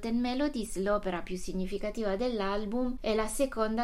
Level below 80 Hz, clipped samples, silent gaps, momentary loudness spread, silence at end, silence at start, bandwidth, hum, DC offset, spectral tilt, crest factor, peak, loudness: -44 dBFS; under 0.1%; none; 6 LU; 0 s; 0 s; 16 kHz; none; under 0.1%; -5 dB/octave; 14 dB; -16 dBFS; -32 LUFS